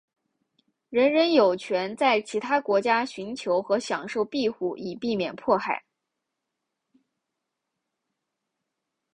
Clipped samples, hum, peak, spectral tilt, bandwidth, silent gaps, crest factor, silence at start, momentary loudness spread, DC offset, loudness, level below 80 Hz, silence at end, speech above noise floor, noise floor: under 0.1%; none; -6 dBFS; -4.5 dB/octave; 10.5 kHz; none; 20 dB; 0.9 s; 11 LU; under 0.1%; -25 LUFS; -70 dBFS; 3.4 s; 59 dB; -83 dBFS